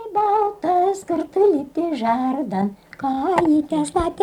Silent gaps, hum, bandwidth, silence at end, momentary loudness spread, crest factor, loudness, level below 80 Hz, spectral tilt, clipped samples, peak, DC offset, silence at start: none; none; 12 kHz; 0 s; 7 LU; 14 dB; -20 LUFS; -48 dBFS; -6.5 dB/octave; under 0.1%; -4 dBFS; under 0.1%; 0 s